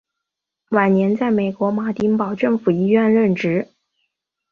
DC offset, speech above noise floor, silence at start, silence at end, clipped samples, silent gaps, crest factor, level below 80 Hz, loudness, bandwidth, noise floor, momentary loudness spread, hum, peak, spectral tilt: under 0.1%; 65 dB; 0.7 s; 0.85 s; under 0.1%; none; 18 dB; -60 dBFS; -18 LUFS; 6.6 kHz; -82 dBFS; 6 LU; none; -2 dBFS; -9 dB/octave